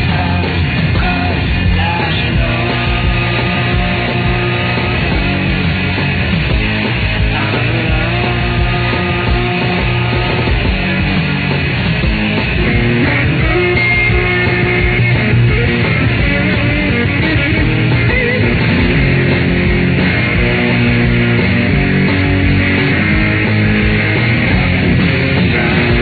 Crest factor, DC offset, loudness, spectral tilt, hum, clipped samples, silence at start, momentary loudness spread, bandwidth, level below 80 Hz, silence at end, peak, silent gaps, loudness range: 12 dB; under 0.1%; -13 LUFS; -9 dB/octave; none; under 0.1%; 0 s; 3 LU; 4.8 kHz; -22 dBFS; 0 s; 0 dBFS; none; 2 LU